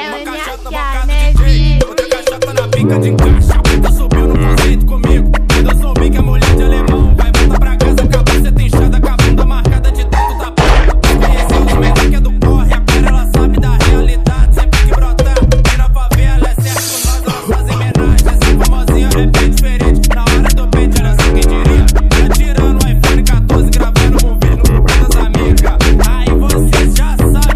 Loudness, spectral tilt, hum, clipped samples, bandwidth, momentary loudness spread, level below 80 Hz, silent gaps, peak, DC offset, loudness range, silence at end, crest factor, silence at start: -11 LUFS; -5.5 dB/octave; none; 0.7%; 15 kHz; 3 LU; -10 dBFS; none; 0 dBFS; under 0.1%; 1 LU; 0 s; 8 dB; 0 s